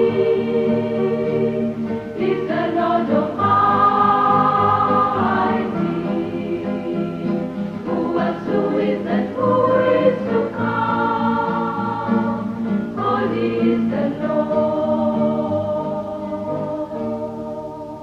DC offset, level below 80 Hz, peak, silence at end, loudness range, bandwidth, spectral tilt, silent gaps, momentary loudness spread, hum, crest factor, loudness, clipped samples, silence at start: under 0.1%; -50 dBFS; -2 dBFS; 0 s; 5 LU; 6.8 kHz; -8.5 dB/octave; none; 10 LU; none; 16 dB; -19 LUFS; under 0.1%; 0 s